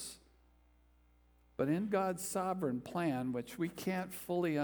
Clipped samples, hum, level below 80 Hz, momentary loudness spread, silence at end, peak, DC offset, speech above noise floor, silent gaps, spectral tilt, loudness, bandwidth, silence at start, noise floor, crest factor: under 0.1%; 60 Hz at -60 dBFS; -68 dBFS; 6 LU; 0 s; -20 dBFS; under 0.1%; 31 dB; none; -5.5 dB/octave; -37 LUFS; over 20 kHz; 0 s; -68 dBFS; 18 dB